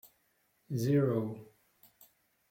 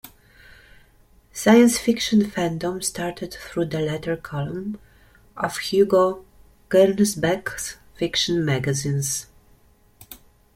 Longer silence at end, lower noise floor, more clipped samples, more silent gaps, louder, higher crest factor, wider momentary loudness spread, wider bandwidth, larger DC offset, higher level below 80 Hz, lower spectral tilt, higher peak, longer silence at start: first, 1.05 s vs 0.4 s; first, -74 dBFS vs -56 dBFS; neither; neither; second, -32 LUFS vs -22 LUFS; about the same, 18 dB vs 20 dB; second, 13 LU vs 16 LU; about the same, 16.5 kHz vs 16.5 kHz; neither; second, -74 dBFS vs -52 dBFS; first, -8 dB/octave vs -4.5 dB/octave; second, -18 dBFS vs -2 dBFS; first, 0.7 s vs 0.05 s